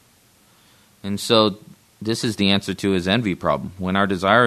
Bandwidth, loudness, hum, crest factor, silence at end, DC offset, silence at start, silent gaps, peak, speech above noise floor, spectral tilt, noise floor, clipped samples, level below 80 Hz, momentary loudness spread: 13.5 kHz; -21 LUFS; none; 20 dB; 0 s; under 0.1%; 1.05 s; none; 0 dBFS; 36 dB; -5 dB/octave; -56 dBFS; under 0.1%; -54 dBFS; 12 LU